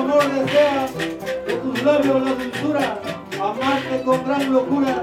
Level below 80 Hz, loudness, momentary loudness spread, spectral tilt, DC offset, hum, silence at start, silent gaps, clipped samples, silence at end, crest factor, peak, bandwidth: -54 dBFS; -20 LUFS; 8 LU; -5.5 dB/octave; under 0.1%; none; 0 s; none; under 0.1%; 0 s; 14 dB; -4 dBFS; 16 kHz